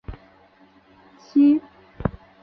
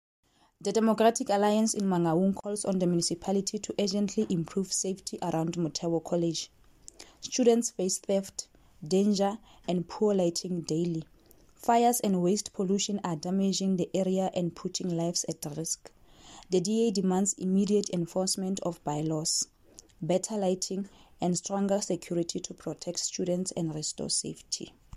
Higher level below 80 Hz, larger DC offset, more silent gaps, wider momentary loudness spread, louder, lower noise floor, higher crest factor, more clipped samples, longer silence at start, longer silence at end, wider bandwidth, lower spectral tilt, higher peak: first, -44 dBFS vs -64 dBFS; neither; neither; first, 13 LU vs 10 LU; first, -21 LUFS vs -29 LUFS; second, -54 dBFS vs -58 dBFS; about the same, 16 dB vs 18 dB; neither; second, 0.1 s vs 0.6 s; first, 0.35 s vs 0 s; second, 6 kHz vs 13.5 kHz; first, -9.5 dB/octave vs -5 dB/octave; first, -8 dBFS vs -12 dBFS